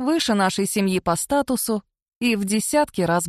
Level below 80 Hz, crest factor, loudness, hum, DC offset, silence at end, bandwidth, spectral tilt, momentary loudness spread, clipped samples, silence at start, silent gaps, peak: -52 dBFS; 14 dB; -21 LUFS; none; under 0.1%; 0 s; 14 kHz; -4 dB/octave; 4 LU; under 0.1%; 0 s; 2.02-2.06 s, 2.16-2.21 s; -6 dBFS